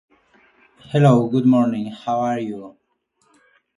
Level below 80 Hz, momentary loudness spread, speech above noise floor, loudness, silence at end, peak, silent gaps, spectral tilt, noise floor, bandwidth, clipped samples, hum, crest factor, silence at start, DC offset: -62 dBFS; 12 LU; 49 dB; -19 LUFS; 1.1 s; 0 dBFS; none; -8.5 dB/octave; -66 dBFS; 10.5 kHz; under 0.1%; none; 20 dB; 0.9 s; under 0.1%